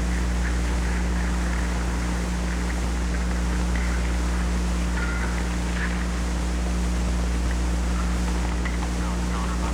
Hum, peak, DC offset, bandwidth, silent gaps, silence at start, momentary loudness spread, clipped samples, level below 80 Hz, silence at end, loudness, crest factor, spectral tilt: 60 Hz at -25 dBFS; -14 dBFS; under 0.1%; 12.5 kHz; none; 0 s; 1 LU; under 0.1%; -26 dBFS; 0 s; -26 LUFS; 10 dB; -5.5 dB/octave